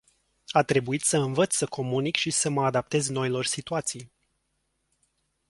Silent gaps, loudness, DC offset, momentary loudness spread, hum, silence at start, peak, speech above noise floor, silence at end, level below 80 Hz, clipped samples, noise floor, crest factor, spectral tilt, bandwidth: none; -26 LUFS; under 0.1%; 5 LU; none; 0.5 s; -4 dBFS; 50 dB; 1.45 s; -64 dBFS; under 0.1%; -76 dBFS; 24 dB; -3.5 dB/octave; 11.5 kHz